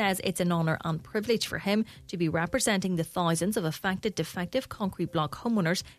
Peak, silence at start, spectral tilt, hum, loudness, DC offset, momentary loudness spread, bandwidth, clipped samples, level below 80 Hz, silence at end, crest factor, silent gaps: -10 dBFS; 0 s; -5 dB/octave; none; -29 LUFS; under 0.1%; 5 LU; 14 kHz; under 0.1%; -56 dBFS; 0.05 s; 18 dB; none